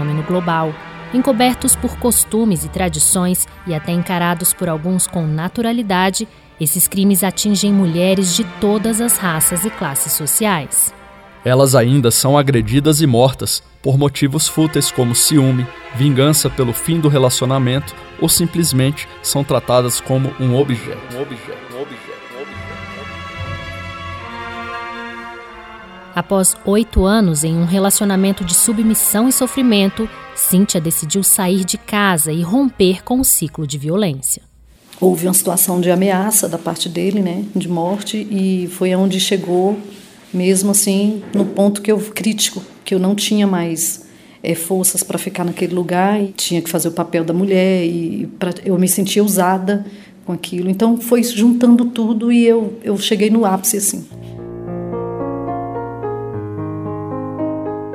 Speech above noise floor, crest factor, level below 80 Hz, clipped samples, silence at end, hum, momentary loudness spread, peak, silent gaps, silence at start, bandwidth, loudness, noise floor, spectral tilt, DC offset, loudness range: 29 dB; 14 dB; -38 dBFS; under 0.1%; 0 s; none; 14 LU; 0 dBFS; none; 0 s; 17 kHz; -15 LUFS; -44 dBFS; -4.5 dB/octave; under 0.1%; 7 LU